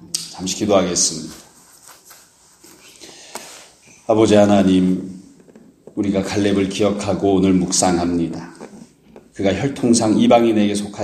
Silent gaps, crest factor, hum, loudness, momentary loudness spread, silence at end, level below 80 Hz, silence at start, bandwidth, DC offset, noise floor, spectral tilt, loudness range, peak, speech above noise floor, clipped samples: none; 18 dB; none; -17 LUFS; 21 LU; 0 s; -52 dBFS; 0.05 s; 14 kHz; under 0.1%; -50 dBFS; -4.5 dB/octave; 5 LU; 0 dBFS; 33 dB; under 0.1%